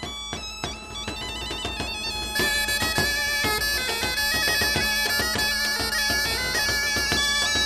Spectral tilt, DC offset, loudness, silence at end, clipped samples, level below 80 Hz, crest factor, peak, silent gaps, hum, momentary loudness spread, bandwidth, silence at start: -1.5 dB/octave; under 0.1%; -23 LUFS; 0 s; under 0.1%; -40 dBFS; 18 dB; -6 dBFS; none; none; 11 LU; 14 kHz; 0 s